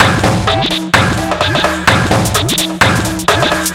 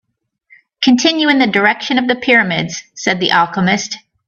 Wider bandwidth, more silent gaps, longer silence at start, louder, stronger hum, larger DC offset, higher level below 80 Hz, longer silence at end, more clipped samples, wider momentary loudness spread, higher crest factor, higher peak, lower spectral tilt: first, 17.5 kHz vs 7.6 kHz; neither; second, 0 s vs 0.8 s; about the same, -12 LUFS vs -13 LUFS; neither; neither; first, -30 dBFS vs -58 dBFS; second, 0 s vs 0.3 s; first, 0.3% vs under 0.1%; second, 3 LU vs 8 LU; about the same, 12 dB vs 14 dB; about the same, 0 dBFS vs 0 dBFS; about the same, -4 dB/octave vs -4 dB/octave